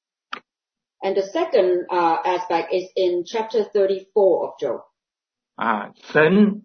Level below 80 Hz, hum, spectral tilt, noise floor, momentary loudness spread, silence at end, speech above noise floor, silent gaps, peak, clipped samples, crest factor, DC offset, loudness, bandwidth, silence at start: -68 dBFS; none; -6.5 dB/octave; -88 dBFS; 11 LU; 0.05 s; 68 dB; none; -4 dBFS; under 0.1%; 18 dB; under 0.1%; -21 LUFS; 6.6 kHz; 0.3 s